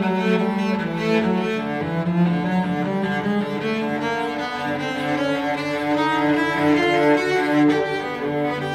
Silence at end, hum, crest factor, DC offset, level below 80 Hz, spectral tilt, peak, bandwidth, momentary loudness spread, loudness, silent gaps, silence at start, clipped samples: 0 s; none; 14 dB; under 0.1%; -56 dBFS; -6.5 dB/octave; -6 dBFS; 14.5 kHz; 7 LU; -21 LUFS; none; 0 s; under 0.1%